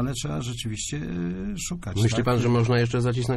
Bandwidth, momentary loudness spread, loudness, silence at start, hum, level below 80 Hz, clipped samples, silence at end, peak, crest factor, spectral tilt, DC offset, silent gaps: 13 kHz; 9 LU; -25 LUFS; 0 s; none; -42 dBFS; under 0.1%; 0 s; -10 dBFS; 14 dB; -5.5 dB/octave; under 0.1%; none